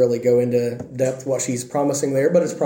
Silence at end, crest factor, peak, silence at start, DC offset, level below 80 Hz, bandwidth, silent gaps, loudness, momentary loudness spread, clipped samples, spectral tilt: 0 s; 14 dB; -4 dBFS; 0 s; under 0.1%; -64 dBFS; 17 kHz; none; -20 LUFS; 6 LU; under 0.1%; -5.5 dB/octave